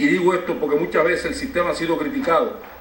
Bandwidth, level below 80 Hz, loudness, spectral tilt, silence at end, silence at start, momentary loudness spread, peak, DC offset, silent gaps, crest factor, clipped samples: 16.5 kHz; -46 dBFS; -21 LUFS; -5.5 dB/octave; 0 s; 0 s; 4 LU; -4 dBFS; under 0.1%; none; 16 dB; under 0.1%